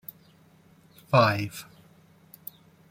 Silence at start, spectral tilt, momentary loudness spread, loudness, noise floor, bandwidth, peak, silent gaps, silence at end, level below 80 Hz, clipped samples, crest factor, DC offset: 1.1 s; -6 dB/octave; 23 LU; -24 LUFS; -58 dBFS; 16.5 kHz; -6 dBFS; none; 1.25 s; -66 dBFS; under 0.1%; 24 dB; under 0.1%